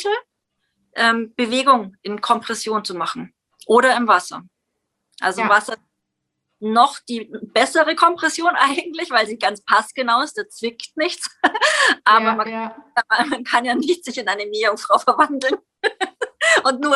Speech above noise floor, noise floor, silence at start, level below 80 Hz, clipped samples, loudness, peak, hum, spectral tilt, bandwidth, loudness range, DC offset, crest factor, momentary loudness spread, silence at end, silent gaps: 59 dB; -77 dBFS; 0 s; -70 dBFS; under 0.1%; -18 LUFS; 0 dBFS; none; -2 dB/octave; 12.5 kHz; 3 LU; under 0.1%; 18 dB; 12 LU; 0 s; none